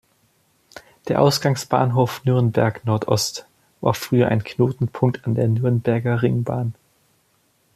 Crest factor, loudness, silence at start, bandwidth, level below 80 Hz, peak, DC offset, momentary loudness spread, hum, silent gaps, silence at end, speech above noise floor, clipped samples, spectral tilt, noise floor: 18 dB; -20 LUFS; 0.75 s; 14.5 kHz; -56 dBFS; -2 dBFS; under 0.1%; 7 LU; none; none; 1.05 s; 44 dB; under 0.1%; -6 dB/octave; -63 dBFS